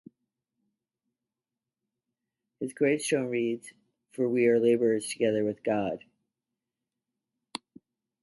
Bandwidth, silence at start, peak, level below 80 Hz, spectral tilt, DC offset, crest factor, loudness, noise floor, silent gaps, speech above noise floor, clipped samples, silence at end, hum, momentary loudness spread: 11.5 kHz; 2.6 s; -12 dBFS; -74 dBFS; -5 dB/octave; under 0.1%; 18 dB; -28 LUFS; under -90 dBFS; none; over 63 dB; under 0.1%; 2.25 s; none; 18 LU